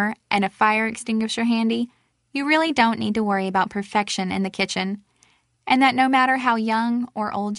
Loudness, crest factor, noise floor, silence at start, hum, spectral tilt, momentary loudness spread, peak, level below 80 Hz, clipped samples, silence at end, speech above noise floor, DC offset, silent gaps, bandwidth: -21 LUFS; 20 dB; -61 dBFS; 0 s; none; -4.5 dB/octave; 9 LU; -2 dBFS; -62 dBFS; under 0.1%; 0 s; 40 dB; under 0.1%; none; 11.5 kHz